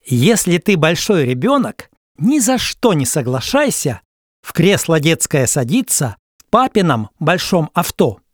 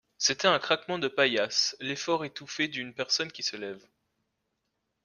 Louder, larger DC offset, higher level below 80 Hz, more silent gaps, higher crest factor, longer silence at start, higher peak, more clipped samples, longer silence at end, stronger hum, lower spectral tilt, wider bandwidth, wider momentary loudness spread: first, -15 LUFS vs -28 LUFS; neither; first, -46 dBFS vs -74 dBFS; first, 1.97-2.15 s, 4.05-4.43 s, 6.19-6.39 s vs none; second, 16 dB vs 22 dB; second, 0.05 s vs 0.2 s; first, 0 dBFS vs -8 dBFS; neither; second, 0.2 s vs 1.25 s; neither; first, -4.5 dB/octave vs -2 dB/octave; first, over 20 kHz vs 11 kHz; second, 6 LU vs 11 LU